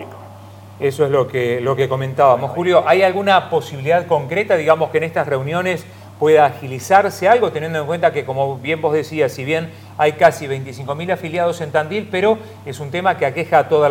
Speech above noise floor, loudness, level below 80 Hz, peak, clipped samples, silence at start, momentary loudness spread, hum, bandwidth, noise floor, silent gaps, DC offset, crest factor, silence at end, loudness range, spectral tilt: 21 dB; -17 LUFS; -62 dBFS; 0 dBFS; under 0.1%; 0 s; 9 LU; none; 17 kHz; -38 dBFS; none; under 0.1%; 16 dB; 0 s; 3 LU; -5.5 dB/octave